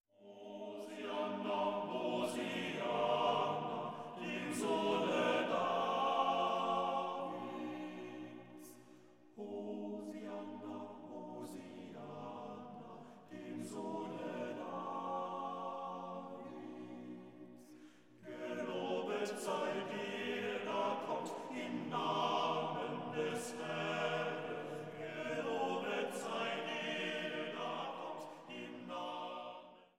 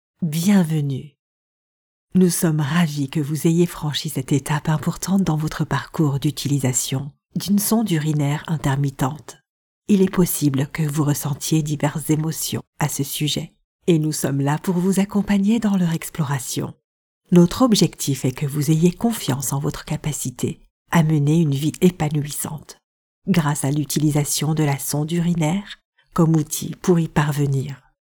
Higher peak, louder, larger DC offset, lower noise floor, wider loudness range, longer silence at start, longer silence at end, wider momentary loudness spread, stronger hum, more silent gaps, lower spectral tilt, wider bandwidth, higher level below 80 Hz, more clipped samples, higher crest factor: second, -22 dBFS vs -2 dBFS; second, -40 LUFS vs -20 LUFS; neither; second, -63 dBFS vs under -90 dBFS; first, 12 LU vs 2 LU; about the same, 0.2 s vs 0.2 s; second, 0.15 s vs 0.3 s; first, 16 LU vs 9 LU; neither; second, none vs 1.19-2.07 s, 9.49-9.82 s, 12.67-12.73 s, 13.64-13.79 s, 16.84-17.21 s, 20.70-20.85 s, 22.84-23.22 s, 25.85-25.93 s; about the same, -4.5 dB/octave vs -5.5 dB/octave; second, 16.5 kHz vs 20 kHz; second, -88 dBFS vs -48 dBFS; neither; about the same, 18 dB vs 18 dB